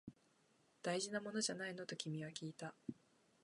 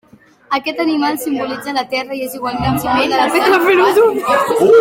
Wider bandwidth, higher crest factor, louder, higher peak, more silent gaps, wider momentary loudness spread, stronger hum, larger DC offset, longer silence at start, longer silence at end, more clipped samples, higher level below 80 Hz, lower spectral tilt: second, 11.5 kHz vs 17 kHz; first, 22 dB vs 12 dB; second, -45 LUFS vs -14 LUFS; second, -26 dBFS vs -2 dBFS; neither; first, 13 LU vs 10 LU; neither; neither; second, 0.05 s vs 0.5 s; first, 0.5 s vs 0 s; neither; second, -86 dBFS vs -44 dBFS; about the same, -3.5 dB/octave vs -4.5 dB/octave